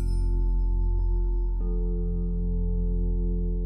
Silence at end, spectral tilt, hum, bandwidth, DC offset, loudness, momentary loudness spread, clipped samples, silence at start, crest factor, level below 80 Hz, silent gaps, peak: 0 s; -10.5 dB/octave; none; 1.3 kHz; under 0.1%; -29 LUFS; 2 LU; under 0.1%; 0 s; 8 dB; -24 dBFS; none; -18 dBFS